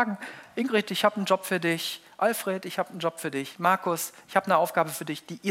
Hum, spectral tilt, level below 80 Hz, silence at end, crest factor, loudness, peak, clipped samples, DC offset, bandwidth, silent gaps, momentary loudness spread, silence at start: none; -4 dB/octave; -80 dBFS; 0 s; 20 dB; -27 LUFS; -6 dBFS; under 0.1%; under 0.1%; 16 kHz; none; 9 LU; 0 s